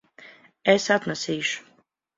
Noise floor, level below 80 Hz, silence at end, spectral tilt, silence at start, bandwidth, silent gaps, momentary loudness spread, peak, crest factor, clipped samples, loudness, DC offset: -63 dBFS; -68 dBFS; 0.55 s; -3.5 dB/octave; 0.2 s; 7.8 kHz; none; 8 LU; -4 dBFS; 22 dB; under 0.1%; -24 LUFS; under 0.1%